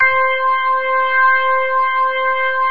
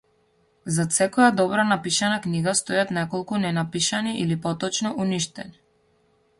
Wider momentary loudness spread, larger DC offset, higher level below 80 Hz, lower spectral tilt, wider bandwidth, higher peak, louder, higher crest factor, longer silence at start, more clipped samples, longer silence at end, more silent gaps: second, 4 LU vs 9 LU; first, 3% vs under 0.1%; about the same, -60 dBFS vs -62 dBFS; about the same, -4 dB/octave vs -4 dB/octave; second, 5 kHz vs 11.5 kHz; about the same, -4 dBFS vs -4 dBFS; first, -15 LUFS vs -23 LUFS; second, 12 dB vs 20 dB; second, 0 s vs 0.65 s; neither; second, 0 s vs 0.9 s; neither